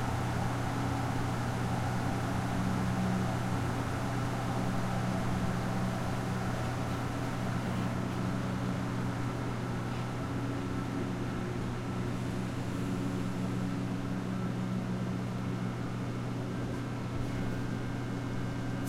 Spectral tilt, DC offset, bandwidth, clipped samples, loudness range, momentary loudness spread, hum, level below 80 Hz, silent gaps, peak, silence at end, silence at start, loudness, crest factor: -6.5 dB/octave; under 0.1%; 15 kHz; under 0.1%; 3 LU; 3 LU; none; -48 dBFS; none; -20 dBFS; 0 s; 0 s; -34 LUFS; 14 dB